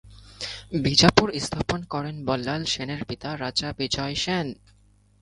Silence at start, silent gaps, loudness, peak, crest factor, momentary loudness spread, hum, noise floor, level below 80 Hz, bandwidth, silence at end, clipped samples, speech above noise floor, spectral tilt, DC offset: 0.05 s; none; -25 LUFS; 0 dBFS; 26 dB; 14 LU; none; -58 dBFS; -46 dBFS; 11.5 kHz; 0.7 s; under 0.1%; 33 dB; -4 dB/octave; under 0.1%